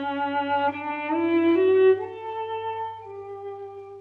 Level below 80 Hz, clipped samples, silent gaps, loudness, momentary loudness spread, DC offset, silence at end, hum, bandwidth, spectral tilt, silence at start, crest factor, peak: -72 dBFS; under 0.1%; none; -24 LUFS; 18 LU; under 0.1%; 0 s; none; 4.3 kHz; -7.5 dB/octave; 0 s; 14 dB; -12 dBFS